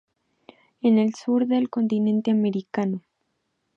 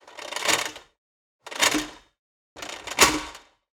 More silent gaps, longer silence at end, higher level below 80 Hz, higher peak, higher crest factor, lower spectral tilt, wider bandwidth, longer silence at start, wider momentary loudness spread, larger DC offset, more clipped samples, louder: second, none vs 0.98-1.39 s, 2.19-2.56 s; first, 0.75 s vs 0.4 s; second, -74 dBFS vs -54 dBFS; second, -10 dBFS vs -4 dBFS; second, 14 dB vs 24 dB; first, -7.5 dB/octave vs -0.5 dB/octave; second, 7.2 kHz vs 19 kHz; first, 0.85 s vs 0.05 s; second, 7 LU vs 19 LU; neither; neither; about the same, -23 LUFS vs -23 LUFS